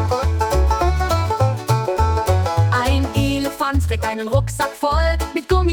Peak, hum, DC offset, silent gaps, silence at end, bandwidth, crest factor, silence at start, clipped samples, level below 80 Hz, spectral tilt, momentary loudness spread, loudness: -4 dBFS; none; under 0.1%; none; 0 s; 19 kHz; 12 dB; 0 s; under 0.1%; -24 dBFS; -6 dB/octave; 3 LU; -19 LUFS